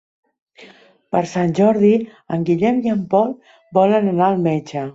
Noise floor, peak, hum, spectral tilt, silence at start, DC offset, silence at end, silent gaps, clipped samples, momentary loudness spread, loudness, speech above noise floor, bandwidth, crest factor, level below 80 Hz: -47 dBFS; -2 dBFS; none; -8 dB/octave; 0.6 s; under 0.1%; 0.05 s; none; under 0.1%; 8 LU; -17 LUFS; 30 dB; 7.8 kHz; 16 dB; -60 dBFS